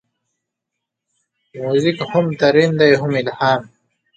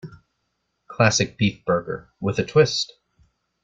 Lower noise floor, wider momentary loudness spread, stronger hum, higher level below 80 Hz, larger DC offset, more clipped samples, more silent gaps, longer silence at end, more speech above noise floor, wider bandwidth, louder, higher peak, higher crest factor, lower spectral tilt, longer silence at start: first, -80 dBFS vs -75 dBFS; second, 7 LU vs 12 LU; neither; second, -60 dBFS vs -54 dBFS; neither; neither; neither; second, 0.5 s vs 0.8 s; first, 65 dB vs 53 dB; about the same, 8.8 kHz vs 9 kHz; first, -16 LUFS vs -21 LUFS; about the same, 0 dBFS vs -2 dBFS; about the same, 18 dB vs 22 dB; first, -6.5 dB/octave vs -4.5 dB/octave; first, 1.55 s vs 0.05 s